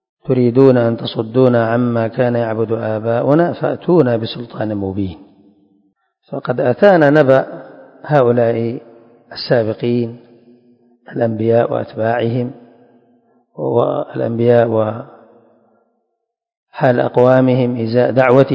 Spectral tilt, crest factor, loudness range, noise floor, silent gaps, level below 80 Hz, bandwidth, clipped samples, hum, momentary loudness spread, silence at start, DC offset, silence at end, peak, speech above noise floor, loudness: -9.5 dB/octave; 16 dB; 5 LU; -73 dBFS; 16.57-16.67 s; -52 dBFS; 6.2 kHz; 0.2%; none; 14 LU; 0.25 s; under 0.1%; 0 s; 0 dBFS; 59 dB; -15 LUFS